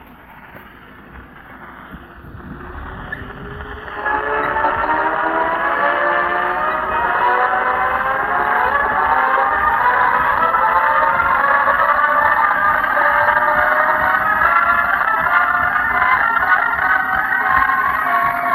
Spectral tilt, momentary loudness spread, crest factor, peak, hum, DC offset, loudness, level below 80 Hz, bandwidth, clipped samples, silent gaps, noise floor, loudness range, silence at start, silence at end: -5.5 dB/octave; 15 LU; 16 dB; 0 dBFS; none; under 0.1%; -15 LUFS; -42 dBFS; 15 kHz; under 0.1%; none; -40 dBFS; 11 LU; 0 s; 0 s